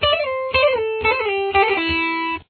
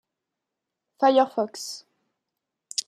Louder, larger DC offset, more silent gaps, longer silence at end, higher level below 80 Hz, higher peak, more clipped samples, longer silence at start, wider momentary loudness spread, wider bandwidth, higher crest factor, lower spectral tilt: first, -18 LUFS vs -23 LUFS; neither; neither; about the same, 0.05 s vs 0.05 s; first, -42 dBFS vs -90 dBFS; first, -4 dBFS vs -8 dBFS; neither; second, 0 s vs 1 s; second, 3 LU vs 16 LU; second, 4.6 kHz vs 14 kHz; about the same, 16 dB vs 20 dB; first, -7 dB/octave vs -2.5 dB/octave